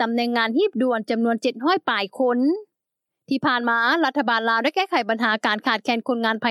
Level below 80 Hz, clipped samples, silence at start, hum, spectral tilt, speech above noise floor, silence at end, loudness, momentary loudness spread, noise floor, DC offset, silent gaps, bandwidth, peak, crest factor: -86 dBFS; under 0.1%; 0 s; none; -4.5 dB/octave; 62 dB; 0 s; -21 LUFS; 4 LU; -83 dBFS; under 0.1%; none; 13 kHz; -6 dBFS; 16 dB